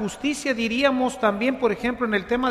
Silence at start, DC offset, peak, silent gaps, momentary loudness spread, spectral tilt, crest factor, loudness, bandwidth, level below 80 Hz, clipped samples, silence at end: 0 s; under 0.1%; -6 dBFS; none; 4 LU; -4.5 dB/octave; 16 dB; -23 LUFS; 14 kHz; -50 dBFS; under 0.1%; 0 s